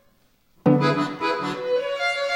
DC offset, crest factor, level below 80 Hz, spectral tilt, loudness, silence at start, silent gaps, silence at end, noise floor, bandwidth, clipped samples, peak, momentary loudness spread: under 0.1%; 20 dB; -66 dBFS; -6.5 dB/octave; -23 LUFS; 0.65 s; none; 0 s; -62 dBFS; 15 kHz; under 0.1%; -4 dBFS; 6 LU